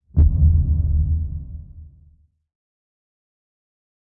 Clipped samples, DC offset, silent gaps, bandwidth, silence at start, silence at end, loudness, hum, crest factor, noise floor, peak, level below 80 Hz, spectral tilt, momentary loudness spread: under 0.1%; under 0.1%; none; 1.1 kHz; 0.15 s; 2.2 s; -19 LUFS; none; 16 dB; -55 dBFS; -6 dBFS; -24 dBFS; -14.5 dB/octave; 19 LU